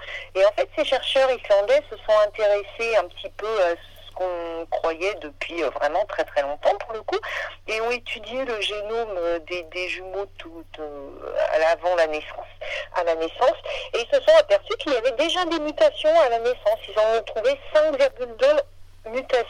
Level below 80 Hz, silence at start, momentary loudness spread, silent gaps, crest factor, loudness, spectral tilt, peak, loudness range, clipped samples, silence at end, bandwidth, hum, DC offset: -48 dBFS; 0 s; 12 LU; none; 18 dB; -23 LUFS; -3 dB/octave; -4 dBFS; 7 LU; under 0.1%; 0 s; 11.5 kHz; none; under 0.1%